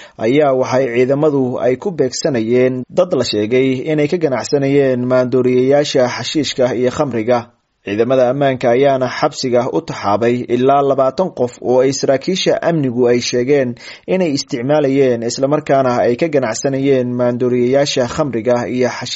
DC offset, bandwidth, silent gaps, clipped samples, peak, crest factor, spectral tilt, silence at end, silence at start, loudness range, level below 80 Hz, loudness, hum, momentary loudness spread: under 0.1%; 8 kHz; none; under 0.1%; 0 dBFS; 14 dB; -5 dB/octave; 0 s; 0 s; 1 LU; -54 dBFS; -15 LUFS; none; 5 LU